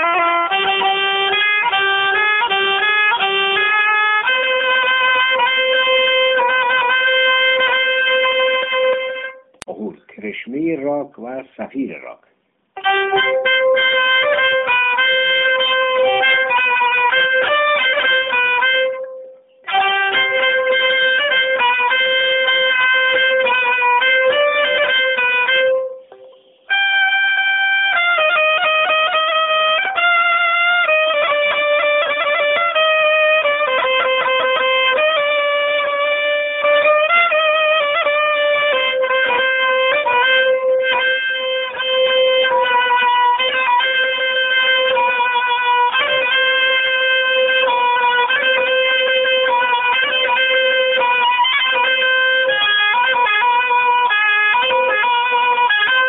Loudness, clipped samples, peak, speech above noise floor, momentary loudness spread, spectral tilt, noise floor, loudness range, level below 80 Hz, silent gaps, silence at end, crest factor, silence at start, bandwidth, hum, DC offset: -14 LUFS; under 0.1%; -2 dBFS; 38 dB; 4 LU; 3 dB/octave; -62 dBFS; 2 LU; -66 dBFS; none; 0 s; 12 dB; 0 s; 4.1 kHz; none; under 0.1%